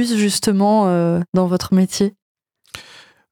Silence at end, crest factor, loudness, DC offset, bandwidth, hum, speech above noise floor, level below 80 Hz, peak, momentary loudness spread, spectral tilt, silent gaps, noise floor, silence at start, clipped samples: 0.5 s; 12 dB; -17 LUFS; under 0.1%; 17.5 kHz; none; 29 dB; -54 dBFS; -6 dBFS; 21 LU; -5.5 dB/octave; 2.22-2.35 s; -45 dBFS; 0 s; under 0.1%